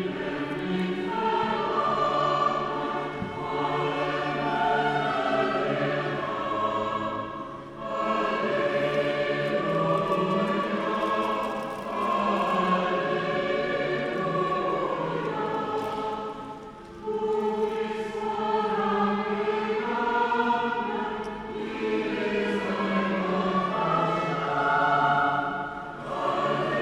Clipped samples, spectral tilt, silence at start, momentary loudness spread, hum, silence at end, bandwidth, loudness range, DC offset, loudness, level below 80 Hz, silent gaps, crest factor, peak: under 0.1%; -6.5 dB/octave; 0 s; 8 LU; none; 0 s; 12.5 kHz; 3 LU; under 0.1%; -27 LUFS; -58 dBFS; none; 16 dB; -10 dBFS